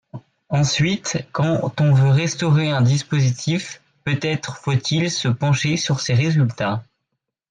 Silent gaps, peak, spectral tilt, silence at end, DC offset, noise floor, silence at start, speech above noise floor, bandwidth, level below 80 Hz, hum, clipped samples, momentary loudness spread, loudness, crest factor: none; -8 dBFS; -5.5 dB/octave; 0.65 s; under 0.1%; -78 dBFS; 0.15 s; 59 dB; 9.4 kHz; -54 dBFS; none; under 0.1%; 8 LU; -20 LUFS; 12 dB